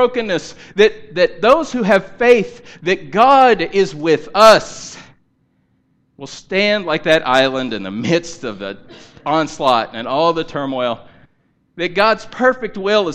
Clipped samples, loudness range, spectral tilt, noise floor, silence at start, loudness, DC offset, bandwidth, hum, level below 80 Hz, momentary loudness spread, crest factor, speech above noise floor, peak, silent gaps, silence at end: under 0.1%; 6 LU; -4.5 dB/octave; -61 dBFS; 0 s; -15 LUFS; under 0.1%; 14.5 kHz; none; -48 dBFS; 17 LU; 16 dB; 46 dB; 0 dBFS; none; 0 s